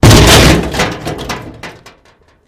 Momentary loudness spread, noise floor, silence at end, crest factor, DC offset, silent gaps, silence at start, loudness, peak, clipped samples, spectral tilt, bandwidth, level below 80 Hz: 25 LU; -48 dBFS; 0.8 s; 10 dB; under 0.1%; none; 0.05 s; -7 LUFS; 0 dBFS; 2%; -4 dB/octave; over 20 kHz; -18 dBFS